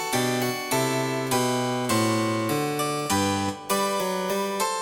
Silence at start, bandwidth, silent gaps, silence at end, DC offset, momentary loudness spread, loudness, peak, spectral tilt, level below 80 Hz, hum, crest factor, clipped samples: 0 s; 19.5 kHz; none; 0 s; under 0.1%; 3 LU; -25 LUFS; -10 dBFS; -4 dB/octave; -62 dBFS; none; 14 dB; under 0.1%